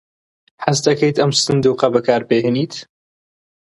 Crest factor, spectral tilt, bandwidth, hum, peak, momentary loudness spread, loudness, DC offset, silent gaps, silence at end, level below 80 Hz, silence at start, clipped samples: 18 dB; -4.5 dB/octave; 11.5 kHz; none; 0 dBFS; 8 LU; -16 LUFS; under 0.1%; none; 0.8 s; -56 dBFS; 0.6 s; under 0.1%